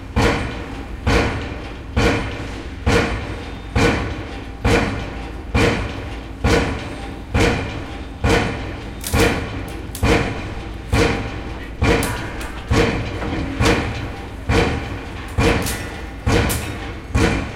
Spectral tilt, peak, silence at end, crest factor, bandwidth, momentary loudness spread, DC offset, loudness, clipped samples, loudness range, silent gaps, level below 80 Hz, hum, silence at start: -5.5 dB/octave; -4 dBFS; 0 s; 16 dB; 16.5 kHz; 12 LU; under 0.1%; -21 LUFS; under 0.1%; 1 LU; none; -26 dBFS; none; 0 s